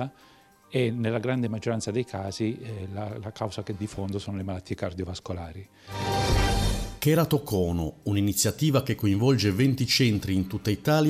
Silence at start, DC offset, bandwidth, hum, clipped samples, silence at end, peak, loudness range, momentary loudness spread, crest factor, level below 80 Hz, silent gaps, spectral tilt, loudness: 0 s; under 0.1%; 16 kHz; none; under 0.1%; 0 s; -12 dBFS; 9 LU; 12 LU; 16 dB; -40 dBFS; none; -5.5 dB/octave; -27 LUFS